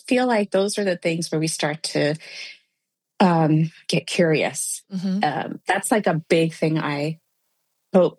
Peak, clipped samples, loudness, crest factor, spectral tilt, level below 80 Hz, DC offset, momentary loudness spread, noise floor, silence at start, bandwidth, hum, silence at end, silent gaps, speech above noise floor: -4 dBFS; under 0.1%; -22 LUFS; 18 dB; -5 dB/octave; -70 dBFS; under 0.1%; 8 LU; -79 dBFS; 0.05 s; 12.5 kHz; none; 0.05 s; none; 58 dB